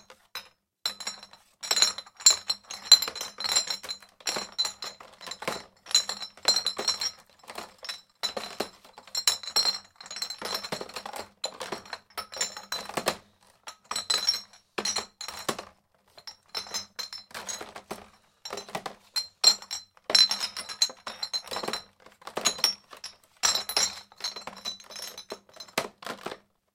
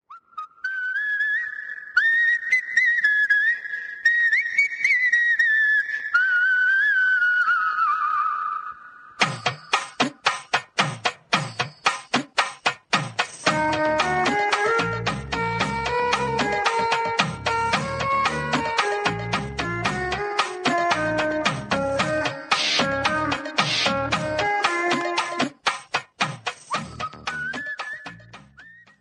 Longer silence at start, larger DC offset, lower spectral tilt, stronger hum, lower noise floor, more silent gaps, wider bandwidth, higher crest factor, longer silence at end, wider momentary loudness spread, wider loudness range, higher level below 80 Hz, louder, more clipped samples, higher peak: about the same, 0.1 s vs 0.1 s; neither; second, 1 dB/octave vs -3 dB/octave; neither; first, -61 dBFS vs -49 dBFS; neither; first, 17 kHz vs 11 kHz; first, 30 dB vs 20 dB; about the same, 0.4 s vs 0.3 s; first, 21 LU vs 11 LU; first, 11 LU vs 6 LU; second, -70 dBFS vs -50 dBFS; second, -27 LUFS vs -22 LUFS; neither; first, 0 dBFS vs -4 dBFS